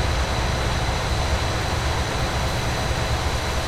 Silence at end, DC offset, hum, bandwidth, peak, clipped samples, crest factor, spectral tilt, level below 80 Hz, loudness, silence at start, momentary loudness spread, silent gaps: 0 s; under 0.1%; none; 15.5 kHz; -10 dBFS; under 0.1%; 12 dB; -4 dB/octave; -28 dBFS; -23 LUFS; 0 s; 1 LU; none